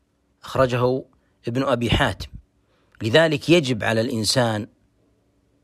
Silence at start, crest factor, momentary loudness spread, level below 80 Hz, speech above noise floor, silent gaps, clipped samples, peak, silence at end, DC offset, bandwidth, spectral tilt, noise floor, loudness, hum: 0.45 s; 18 dB; 13 LU; -42 dBFS; 43 dB; none; under 0.1%; -4 dBFS; 0.95 s; under 0.1%; 15 kHz; -5 dB/octave; -63 dBFS; -21 LUFS; none